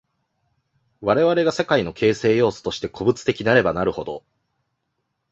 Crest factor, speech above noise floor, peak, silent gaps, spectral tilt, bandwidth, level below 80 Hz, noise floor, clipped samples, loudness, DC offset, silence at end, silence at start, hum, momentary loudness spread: 20 dB; 55 dB; -2 dBFS; none; -5.5 dB/octave; 8.2 kHz; -52 dBFS; -75 dBFS; under 0.1%; -20 LUFS; under 0.1%; 1.15 s; 1 s; none; 10 LU